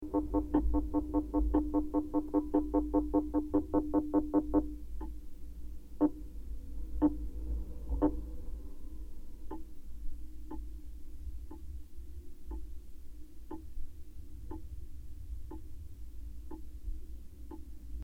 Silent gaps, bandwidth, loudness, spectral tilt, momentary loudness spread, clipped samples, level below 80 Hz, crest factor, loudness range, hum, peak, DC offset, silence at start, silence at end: none; 14.5 kHz; -34 LUFS; -10 dB/octave; 20 LU; under 0.1%; -42 dBFS; 20 dB; 17 LU; none; -14 dBFS; under 0.1%; 0 s; 0 s